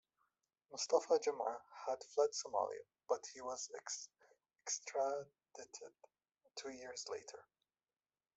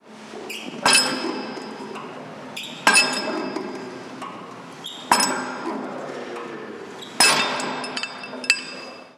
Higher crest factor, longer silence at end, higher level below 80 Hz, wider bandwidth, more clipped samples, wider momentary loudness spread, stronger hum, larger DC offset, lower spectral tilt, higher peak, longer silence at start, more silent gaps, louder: about the same, 24 dB vs 24 dB; first, 0.95 s vs 0.05 s; second, -90 dBFS vs -72 dBFS; second, 8.2 kHz vs over 20 kHz; neither; about the same, 18 LU vs 20 LU; neither; neither; about the same, -1 dB/octave vs -1 dB/octave; second, -20 dBFS vs 0 dBFS; first, 0.7 s vs 0.05 s; neither; second, -42 LUFS vs -21 LUFS